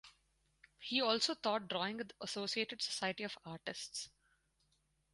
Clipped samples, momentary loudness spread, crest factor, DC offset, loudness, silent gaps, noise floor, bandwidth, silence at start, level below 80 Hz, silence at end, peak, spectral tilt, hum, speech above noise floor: under 0.1%; 12 LU; 22 dB; under 0.1%; -39 LUFS; none; -79 dBFS; 11.5 kHz; 0.05 s; -78 dBFS; 1.05 s; -20 dBFS; -2.5 dB/octave; none; 39 dB